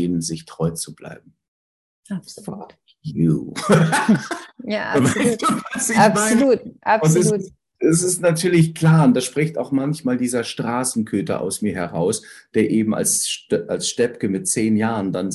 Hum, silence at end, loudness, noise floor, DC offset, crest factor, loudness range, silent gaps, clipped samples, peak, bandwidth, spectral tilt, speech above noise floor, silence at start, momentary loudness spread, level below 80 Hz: none; 0 s; -19 LUFS; under -90 dBFS; under 0.1%; 20 dB; 5 LU; 1.48-2.03 s; under 0.1%; 0 dBFS; 12.5 kHz; -5 dB/octave; over 71 dB; 0 s; 15 LU; -54 dBFS